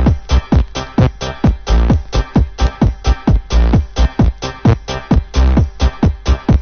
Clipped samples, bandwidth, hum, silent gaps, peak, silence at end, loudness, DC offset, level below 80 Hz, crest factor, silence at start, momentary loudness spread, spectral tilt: under 0.1%; 6.6 kHz; none; none; 0 dBFS; 0 s; -15 LUFS; under 0.1%; -16 dBFS; 12 dB; 0 s; 3 LU; -7 dB/octave